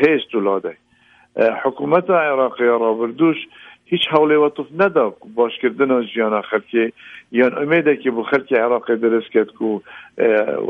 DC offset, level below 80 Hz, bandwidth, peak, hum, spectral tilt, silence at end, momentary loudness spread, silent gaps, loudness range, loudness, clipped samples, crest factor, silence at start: under 0.1%; -66 dBFS; 5 kHz; 0 dBFS; none; -7.5 dB/octave; 0 s; 8 LU; none; 1 LU; -18 LUFS; under 0.1%; 16 dB; 0 s